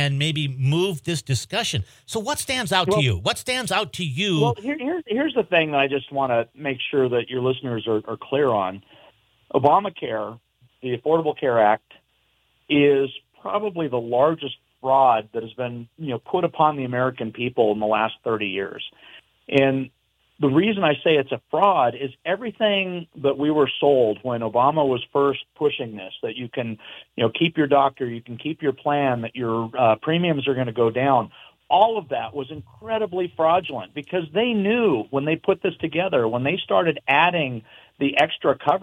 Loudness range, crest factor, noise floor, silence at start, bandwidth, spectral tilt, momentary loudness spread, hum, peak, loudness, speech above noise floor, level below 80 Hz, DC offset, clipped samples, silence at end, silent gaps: 3 LU; 18 dB; -66 dBFS; 0 s; 16.5 kHz; -5.5 dB/octave; 12 LU; none; -4 dBFS; -22 LUFS; 44 dB; -62 dBFS; under 0.1%; under 0.1%; 0 s; none